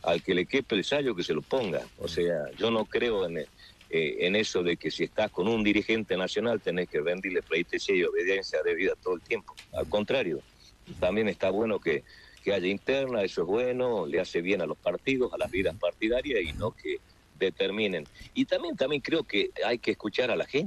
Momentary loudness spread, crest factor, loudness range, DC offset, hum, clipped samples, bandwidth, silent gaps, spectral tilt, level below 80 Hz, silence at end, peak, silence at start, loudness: 6 LU; 18 dB; 2 LU; under 0.1%; none; under 0.1%; 12.5 kHz; none; -5 dB/octave; -56 dBFS; 0 s; -10 dBFS; 0.05 s; -29 LUFS